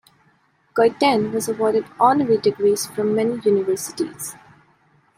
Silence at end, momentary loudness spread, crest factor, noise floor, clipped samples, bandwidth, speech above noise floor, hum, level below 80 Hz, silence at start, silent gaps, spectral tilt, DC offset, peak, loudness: 0.85 s; 10 LU; 18 dB; -60 dBFS; under 0.1%; 16 kHz; 41 dB; none; -64 dBFS; 0.75 s; none; -4.5 dB/octave; under 0.1%; -4 dBFS; -20 LUFS